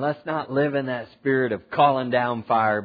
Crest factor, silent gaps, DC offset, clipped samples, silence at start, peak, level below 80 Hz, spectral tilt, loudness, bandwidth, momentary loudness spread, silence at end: 18 dB; none; under 0.1%; under 0.1%; 0 s; -6 dBFS; -66 dBFS; -9.5 dB/octave; -23 LUFS; 5 kHz; 8 LU; 0 s